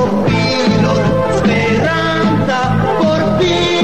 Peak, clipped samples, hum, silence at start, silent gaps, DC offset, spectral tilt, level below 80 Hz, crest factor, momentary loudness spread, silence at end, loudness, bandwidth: -2 dBFS; under 0.1%; none; 0 s; none; 2%; -6 dB/octave; -36 dBFS; 10 dB; 1 LU; 0 s; -13 LUFS; 10.5 kHz